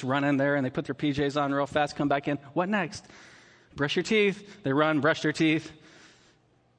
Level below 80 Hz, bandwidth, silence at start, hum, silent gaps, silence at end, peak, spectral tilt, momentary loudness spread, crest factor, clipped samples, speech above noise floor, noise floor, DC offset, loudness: -62 dBFS; 9.6 kHz; 0 s; none; none; 1.05 s; -10 dBFS; -5.5 dB/octave; 8 LU; 18 dB; under 0.1%; 37 dB; -64 dBFS; under 0.1%; -27 LUFS